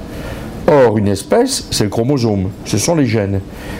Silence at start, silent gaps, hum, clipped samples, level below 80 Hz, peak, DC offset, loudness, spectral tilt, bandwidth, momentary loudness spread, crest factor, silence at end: 0 s; none; none; under 0.1%; -36 dBFS; -2 dBFS; under 0.1%; -14 LUFS; -5.5 dB/octave; 16 kHz; 11 LU; 14 dB; 0 s